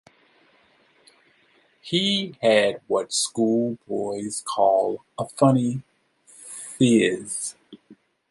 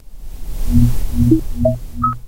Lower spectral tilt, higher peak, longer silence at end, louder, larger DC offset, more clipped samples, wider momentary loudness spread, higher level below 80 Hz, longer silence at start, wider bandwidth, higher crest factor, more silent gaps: second, -4.5 dB/octave vs -8.5 dB/octave; second, -4 dBFS vs 0 dBFS; first, 0.35 s vs 0 s; second, -23 LUFS vs -17 LUFS; neither; neither; about the same, 14 LU vs 15 LU; second, -68 dBFS vs -20 dBFS; first, 1.85 s vs 0.1 s; second, 11.5 kHz vs 16 kHz; first, 20 dB vs 14 dB; neither